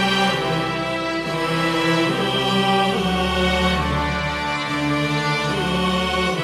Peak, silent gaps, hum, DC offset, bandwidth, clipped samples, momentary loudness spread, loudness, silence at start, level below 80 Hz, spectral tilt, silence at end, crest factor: -6 dBFS; none; none; under 0.1%; 14 kHz; under 0.1%; 4 LU; -20 LUFS; 0 s; -36 dBFS; -5 dB/octave; 0 s; 14 dB